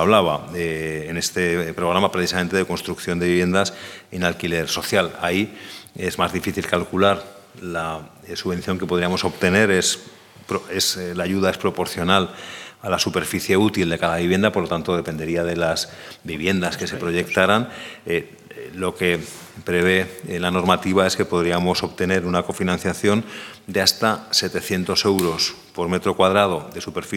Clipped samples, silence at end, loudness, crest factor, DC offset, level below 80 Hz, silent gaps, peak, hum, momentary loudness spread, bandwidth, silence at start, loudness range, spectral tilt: under 0.1%; 0 s; -21 LUFS; 22 dB; under 0.1%; -50 dBFS; none; 0 dBFS; none; 11 LU; 18.5 kHz; 0 s; 3 LU; -4 dB/octave